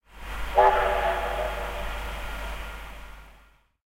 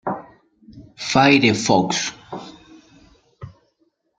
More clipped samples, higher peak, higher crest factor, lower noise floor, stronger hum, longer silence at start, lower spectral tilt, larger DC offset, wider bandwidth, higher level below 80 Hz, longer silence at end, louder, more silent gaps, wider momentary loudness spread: neither; second, -6 dBFS vs -2 dBFS; about the same, 22 dB vs 20 dB; second, -57 dBFS vs -66 dBFS; neither; about the same, 0.1 s vs 0.05 s; about the same, -4.5 dB/octave vs -4 dB/octave; neither; first, 16 kHz vs 9.4 kHz; first, -36 dBFS vs -56 dBFS; second, 0.55 s vs 0.7 s; second, -26 LUFS vs -17 LUFS; neither; about the same, 20 LU vs 22 LU